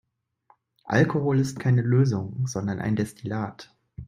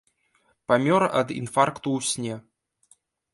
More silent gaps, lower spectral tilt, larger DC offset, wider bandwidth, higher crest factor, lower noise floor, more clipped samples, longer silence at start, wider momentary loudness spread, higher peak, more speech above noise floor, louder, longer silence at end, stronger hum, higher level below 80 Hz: neither; first, -7.5 dB/octave vs -4.5 dB/octave; neither; about the same, 12 kHz vs 11.5 kHz; about the same, 20 dB vs 22 dB; about the same, -64 dBFS vs -67 dBFS; neither; first, 0.85 s vs 0.7 s; second, 10 LU vs 13 LU; about the same, -6 dBFS vs -4 dBFS; second, 40 dB vs 44 dB; about the same, -25 LUFS vs -24 LUFS; second, 0.05 s vs 0.95 s; neither; first, -56 dBFS vs -66 dBFS